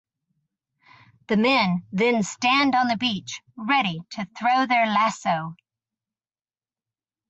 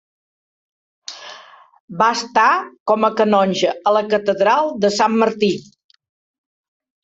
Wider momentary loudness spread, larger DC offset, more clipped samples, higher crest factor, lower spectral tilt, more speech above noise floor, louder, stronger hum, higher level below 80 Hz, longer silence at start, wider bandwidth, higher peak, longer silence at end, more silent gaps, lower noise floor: second, 13 LU vs 19 LU; neither; neither; about the same, 18 dB vs 16 dB; about the same, -4.5 dB/octave vs -4.5 dB/octave; first, over 68 dB vs 26 dB; second, -22 LUFS vs -16 LUFS; neither; about the same, -66 dBFS vs -64 dBFS; first, 1.3 s vs 1.1 s; about the same, 8.2 kHz vs 8 kHz; second, -8 dBFS vs -2 dBFS; first, 1.75 s vs 1.45 s; second, none vs 1.80-1.88 s, 2.80-2.86 s; first, under -90 dBFS vs -42 dBFS